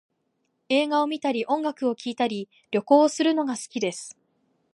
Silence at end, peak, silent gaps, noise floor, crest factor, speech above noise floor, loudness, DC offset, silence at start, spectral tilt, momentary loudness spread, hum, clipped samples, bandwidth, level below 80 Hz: 0.6 s; -4 dBFS; none; -74 dBFS; 20 dB; 50 dB; -24 LUFS; under 0.1%; 0.7 s; -4 dB/octave; 10 LU; none; under 0.1%; 11.5 kHz; -80 dBFS